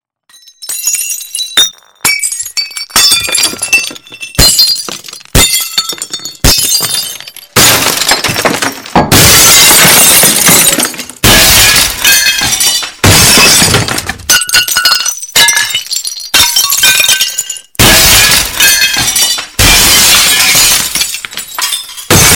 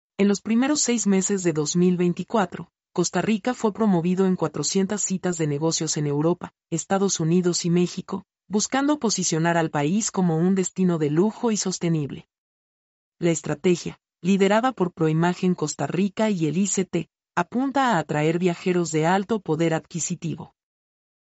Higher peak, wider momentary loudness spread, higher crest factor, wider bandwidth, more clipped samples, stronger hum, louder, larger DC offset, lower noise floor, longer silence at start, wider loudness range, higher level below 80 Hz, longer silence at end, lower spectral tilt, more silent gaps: first, 0 dBFS vs -8 dBFS; first, 13 LU vs 7 LU; second, 8 dB vs 16 dB; first, over 20 kHz vs 8.2 kHz; first, 4% vs under 0.1%; neither; first, -5 LUFS vs -23 LUFS; neither; second, -41 dBFS vs under -90 dBFS; first, 0.6 s vs 0.2 s; first, 6 LU vs 2 LU; first, -26 dBFS vs -64 dBFS; second, 0 s vs 0.95 s; second, -1 dB/octave vs -5 dB/octave; second, none vs 12.38-13.12 s